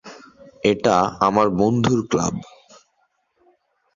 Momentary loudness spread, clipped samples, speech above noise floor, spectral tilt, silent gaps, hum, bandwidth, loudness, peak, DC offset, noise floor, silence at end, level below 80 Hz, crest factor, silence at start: 6 LU; under 0.1%; 49 dB; -5.5 dB/octave; none; none; 7.6 kHz; -19 LUFS; -2 dBFS; under 0.1%; -68 dBFS; 1.5 s; -52 dBFS; 20 dB; 0.05 s